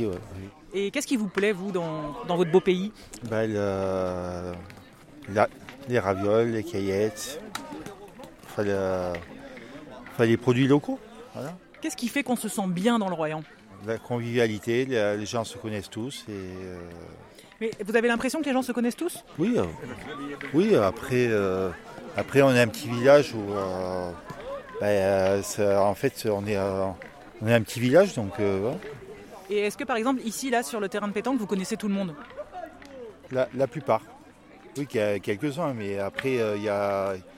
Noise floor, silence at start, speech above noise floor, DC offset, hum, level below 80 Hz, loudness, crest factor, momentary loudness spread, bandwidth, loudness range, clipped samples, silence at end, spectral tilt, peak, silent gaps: -50 dBFS; 0 s; 24 dB; under 0.1%; none; -58 dBFS; -26 LUFS; 22 dB; 18 LU; 16.5 kHz; 6 LU; under 0.1%; 0 s; -5.5 dB/octave; -6 dBFS; none